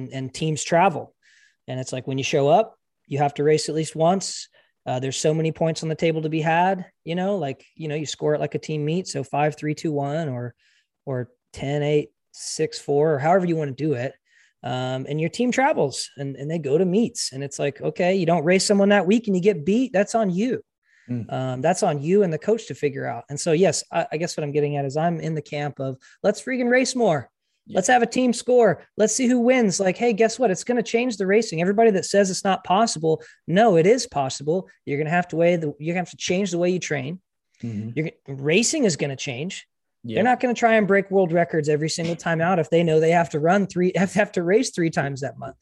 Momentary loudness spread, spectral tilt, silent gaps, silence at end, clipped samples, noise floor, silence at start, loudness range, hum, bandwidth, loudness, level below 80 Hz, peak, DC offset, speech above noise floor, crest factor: 12 LU; -5 dB/octave; 20.78-20.82 s; 0.1 s; under 0.1%; -59 dBFS; 0 s; 5 LU; none; 12 kHz; -22 LUFS; -64 dBFS; -4 dBFS; under 0.1%; 37 dB; 18 dB